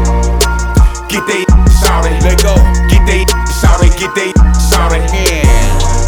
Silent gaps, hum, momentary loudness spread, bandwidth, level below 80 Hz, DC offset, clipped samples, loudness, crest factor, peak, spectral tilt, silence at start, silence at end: none; none; 4 LU; 18.5 kHz; -10 dBFS; under 0.1%; under 0.1%; -10 LUFS; 8 dB; 0 dBFS; -4.5 dB/octave; 0 s; 0 s